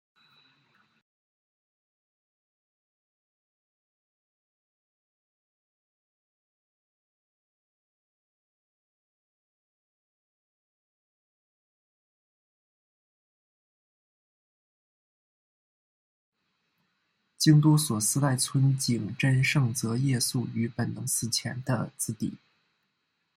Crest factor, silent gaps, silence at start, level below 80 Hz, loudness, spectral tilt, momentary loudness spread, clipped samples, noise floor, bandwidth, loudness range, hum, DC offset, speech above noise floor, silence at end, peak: 24 dB; none; 17.4 s; -70 dBFS; -26 LUFS; -4.5 dB/octave; 11 LU; under 0.1%; -78 dBFS; 16 kHz; 5 LU; none; under 0.1%; 52 dB; 1 s; -8 dBFS